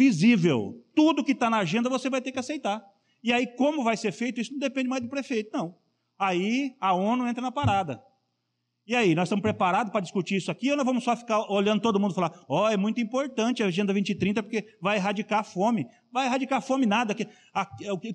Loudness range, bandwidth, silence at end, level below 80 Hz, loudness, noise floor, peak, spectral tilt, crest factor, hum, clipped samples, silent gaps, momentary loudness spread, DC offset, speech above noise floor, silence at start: 3 LU; 10 kHz; 0 s; -64 dBFS; -26 LUFS; -79 dBFS; -10 dBFS; -5.5 dB/octave; 16 dB; none; under 0.1%; none; 8 LU; under 0.1%; 53 dB; 0 s